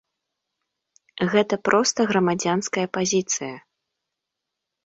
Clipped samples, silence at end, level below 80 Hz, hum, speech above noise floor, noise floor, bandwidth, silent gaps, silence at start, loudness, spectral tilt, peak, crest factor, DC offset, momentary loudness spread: under 0.1%; 1.25 s; -66 dBFS; none; 62 dB; -83 dBFS; 8 kHz; none; 1.15 s; -22 LUFS; -4 dB/octave; -4 dBFS; 22 dB; under 0.1%; 8 LU